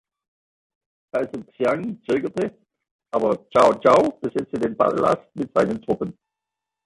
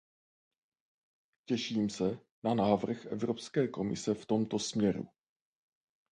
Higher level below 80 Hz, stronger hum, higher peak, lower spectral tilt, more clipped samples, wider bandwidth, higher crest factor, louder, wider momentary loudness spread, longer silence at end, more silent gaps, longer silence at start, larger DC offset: first, -58 dBFS vs -68 dBFS; neither; first, -4 dBFS vs -12 dBFS; about the same, -6.5 dB/octave vs -5.5 dB/octave; neither; first, 11.5 kHz vs 10 kHz; about the same, 20 dB vs 22 dB; first, -22 LUFS vs -33 LUFS; first, 11 LU vs 7 LU; second, 0.75 s vs 1.05 s; about the same, 2.91-2.99 s vs 2.31-2.42 s; second, 1.15 s vs 1.5 s; neither